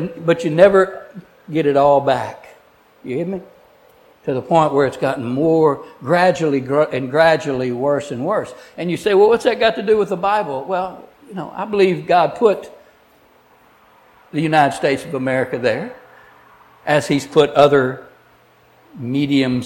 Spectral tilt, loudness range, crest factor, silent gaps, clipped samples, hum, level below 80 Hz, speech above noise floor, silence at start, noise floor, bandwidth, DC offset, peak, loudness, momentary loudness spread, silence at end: -6 dB/octave; 4 LU; 18 dB; none; under 0.1%; none; -56 dBFS; 36 dB; 0 s; -52 dBFS; 16.5 kHz; under 0.1%; 0 dBFS; -17 LUFS; 14 LU; 0 s